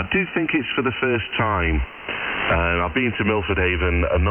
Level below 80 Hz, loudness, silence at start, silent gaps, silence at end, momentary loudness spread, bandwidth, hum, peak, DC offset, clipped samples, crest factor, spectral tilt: -30 dBFS; -21 LUFS; 0 s; none; 0 s; 4 LU; 3.5 kHz; none; -6 dBFS; under 0.1%; under 0.1%; 14 dB; -9.5 dB/octave